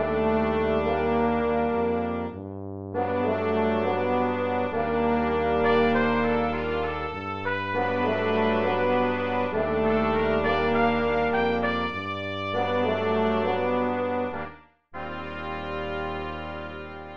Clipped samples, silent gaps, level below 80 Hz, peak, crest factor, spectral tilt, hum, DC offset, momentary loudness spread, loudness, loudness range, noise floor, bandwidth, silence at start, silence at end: under 0.1%; none; -46 dBFS; -10 dBFS; 16 dB; -8 dB/octave; none; 0.6%; 11 LU; -25 LUFS; 4 LU; -46 dBFS; 6.6 kHz; 0 s; 0 s